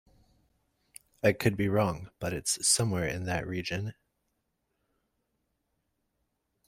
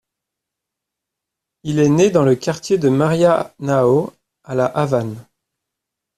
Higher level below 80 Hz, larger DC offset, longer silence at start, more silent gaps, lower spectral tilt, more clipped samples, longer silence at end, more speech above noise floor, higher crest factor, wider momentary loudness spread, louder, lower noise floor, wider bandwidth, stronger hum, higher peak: about the same, -58 dBFS vs -56 dBFS; neither; second, 1.25 s vs 1.65 s; neither; second, -4 dB/octave vs -6.5 dB/octave; neither; first, 2.75 s vs 0.95 s; second, 50 dB vs 67 dB; first, 24 dB vs 16 dB; about the same, 11 LU vs 13 LU; second, -29 LUFS vs -17 LUFS; about the same, -80 dBFS vs -82 dBFS; first, 16 kHz vs 13.5 kHz; neither; second, -8 dBFS vs -2 dBFS